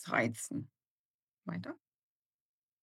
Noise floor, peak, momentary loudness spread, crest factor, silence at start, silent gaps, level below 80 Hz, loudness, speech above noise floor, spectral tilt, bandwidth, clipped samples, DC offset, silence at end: under -90 dBFS; -16 dBFS; 19 LU; 26 dB; 0 s; 0.87-1.27 s; -86 dBFS; -39 LUFS; over 53 dB; -5 dB/octave; 16.5 kHz; under 0.1%; under 0.1%; 1.05 s